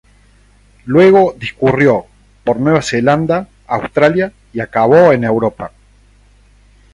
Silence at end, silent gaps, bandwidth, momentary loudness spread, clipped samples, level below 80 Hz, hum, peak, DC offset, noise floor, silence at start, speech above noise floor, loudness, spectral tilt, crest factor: 1.25 s; none; 11 kHz; 13 LU; under 0.1%; -46 dBFS; 50 Hz at -45 dBFS; 0 dBFS; under 0.1%; -48 dBFS; 0.85 s; 36 dB; -13 LUFS; -6.5 dB/octave; 14 dB